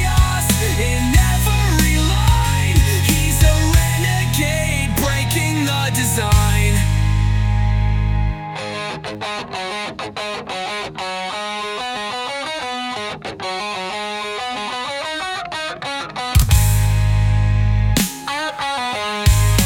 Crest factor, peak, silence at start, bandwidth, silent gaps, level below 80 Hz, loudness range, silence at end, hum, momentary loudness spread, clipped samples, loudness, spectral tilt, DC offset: 16 dB; -2 dBFS; 0 s; 19 kHz; none; -22 dBFS; 8 LU; 0 s; none; 10 LU; under 0.1%; -18 LUFS; -4.5 dB/octave; under 0.1%